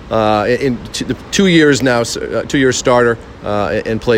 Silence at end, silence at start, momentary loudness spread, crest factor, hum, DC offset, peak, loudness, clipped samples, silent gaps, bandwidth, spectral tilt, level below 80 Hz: 0 s; 0 s; 11 LU; 14 dB; none; under 0.1%; 0 dBFS; -14 LUFS; under 0.1%; none; 16.5 kHz; -4.5 dB/octave; -38 dBFS